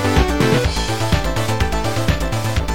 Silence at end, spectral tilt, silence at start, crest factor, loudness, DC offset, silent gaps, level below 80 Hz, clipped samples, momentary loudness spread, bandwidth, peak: 0 s; -5 dB/octave; 0 s; 16 dB; -18 LUFS; under 0.1%; none; -24 dBFS; under 0.1%; 4 LU; 17 kHz; -2 dBFS